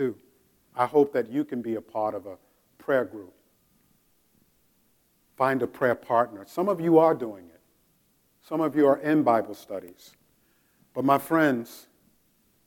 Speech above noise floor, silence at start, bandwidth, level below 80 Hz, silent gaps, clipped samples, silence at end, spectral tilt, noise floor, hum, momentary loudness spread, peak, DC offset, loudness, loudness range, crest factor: 42 dB; 0 s; 17.5 kHz; -74 dBFS; none; under 0.1%; 0.85 s; -7 dB/octave; -67 dBFS; none; 17 LU; -6 dBFS; under 0.1%; -25 LUFS; 8 LU; 20 dB